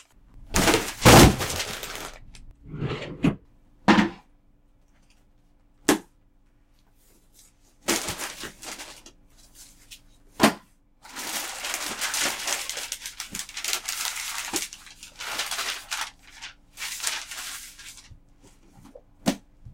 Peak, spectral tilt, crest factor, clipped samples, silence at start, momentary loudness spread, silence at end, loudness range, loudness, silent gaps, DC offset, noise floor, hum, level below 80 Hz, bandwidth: -2 dBFS; -3.5 dB/octave; 24 dB; under 0.1%; 0.35 s; 21 LU; 0 s; 13 LU; -24 LUFS; none; under 0.1%; -59 dBFS; none; -40 dBFS; 17 kHz